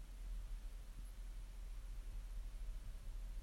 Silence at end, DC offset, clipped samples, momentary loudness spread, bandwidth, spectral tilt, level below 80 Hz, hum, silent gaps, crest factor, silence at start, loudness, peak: 0 s; under 0.1%; under 0.1%; 3 LU; 15.5 kHz; -5 dB/octave; -48 dBFS; none; none; 10 dB; 0 s; -54 LUFS; -38 dBFS